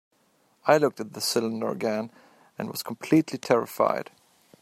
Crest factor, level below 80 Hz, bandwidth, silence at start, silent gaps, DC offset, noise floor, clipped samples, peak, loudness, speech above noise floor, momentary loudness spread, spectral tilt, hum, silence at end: 22 dB; -72 dBFS; 16 kHz; 0.65 s; none; under 0.1%; -66 dBFS; under 0.1%; -4 dBFS; -26 LUFS; 40 dB; 13 LU; -4.5 dB/octave; none; 0.6 s